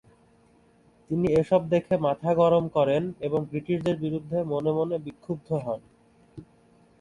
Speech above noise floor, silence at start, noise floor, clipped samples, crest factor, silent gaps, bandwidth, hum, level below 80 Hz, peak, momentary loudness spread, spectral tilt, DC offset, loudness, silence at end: 35 dB; 1.1 s; -60 dBFS; under 0.1%; 18 dB; none; 11 kHz; none; -58 dBFS; -8 dBFS; 10 LU; -8.5 dB/octave; under 0.1%; -26 LUFS; 0.6 s